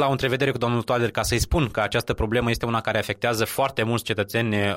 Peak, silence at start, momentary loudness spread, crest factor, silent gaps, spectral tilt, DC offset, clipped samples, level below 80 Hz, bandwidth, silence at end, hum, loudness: -8 dBFS; 0 s; 2 LU; 16 dB; none; -5 dB/octave; under 0.1%; under 0.1%; -38 dBFS; 16 kHz; 0 s; none; -23 LUFS